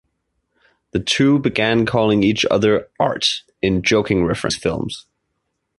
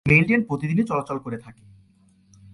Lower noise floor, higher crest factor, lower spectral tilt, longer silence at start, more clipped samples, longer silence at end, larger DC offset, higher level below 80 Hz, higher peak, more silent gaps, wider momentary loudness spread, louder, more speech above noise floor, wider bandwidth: first, -73 dBFS vs -58 dBFS; about the same, 16 dB vs 20 dB; second, -5 dB/octave vs -8 dB/octave; first, 0.95 s vs 0.05 s; neither; second, 0.8 s vs 1 s; neither; first, -44 dBFS vs -50 dBFS; about the same, -2 dBFS vs -4 dBFS; neither; second, 8 LU vs 17 LU; first, -18 LUFS vs -22 LUFS; first, 56 dB vs 36 dB; about the same, 11.5 kHz vs 11 kHz